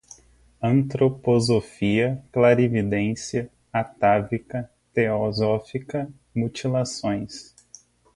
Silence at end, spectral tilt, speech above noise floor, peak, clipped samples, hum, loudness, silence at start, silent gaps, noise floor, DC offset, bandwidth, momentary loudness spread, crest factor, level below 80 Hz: 0.7 s; -6.5 dB/octave; 32 dB; -4 dBFS; under 0.1%; 60 Hz at -45 dBFS; -23 LUFS; 0.6 s; none; -54 dBFS; under 0.1%; 11.5 kHz; 10 LU; 20 dB; -52 dBFS